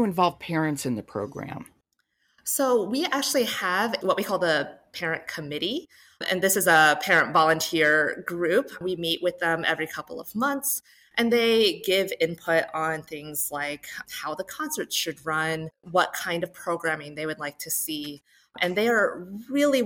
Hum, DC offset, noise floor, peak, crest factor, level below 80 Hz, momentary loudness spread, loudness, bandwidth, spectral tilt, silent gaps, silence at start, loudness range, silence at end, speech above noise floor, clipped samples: none; under 0.1%; -72 dBFS; -8 dBFS; 18 dB; -66 dBFS; 13 LU; -25 LUFS; 16.5 kHz; -3 dB/octave; none; 0 s; 7 LU; 0 s; 47 dB; under 0.1%